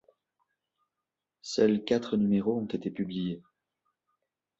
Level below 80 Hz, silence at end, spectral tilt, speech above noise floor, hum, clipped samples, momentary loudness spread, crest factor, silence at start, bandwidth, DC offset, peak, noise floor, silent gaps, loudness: -68 dBFS; 1.2 s; -6.5 dB/octave; 60 dB; none; under 0.1%; 10 LU; 20 dB; 1.45 s; 8 kHz; under 0.1%; -12 dBFS; -88 dBFS; none; -29 LUFS